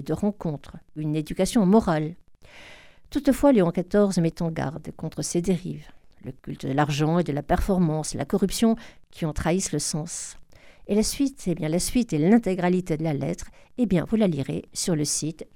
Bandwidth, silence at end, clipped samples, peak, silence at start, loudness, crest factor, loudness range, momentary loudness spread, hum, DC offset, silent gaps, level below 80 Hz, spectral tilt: 17.5 kHz; 0.1 s; under 0.1%; -6 dBFS; 0 s; -24 LUFS; 18 dB; 4 LU; 14 LU; none; 0.2%; none; -42 dBFS; -5.5 dB/octave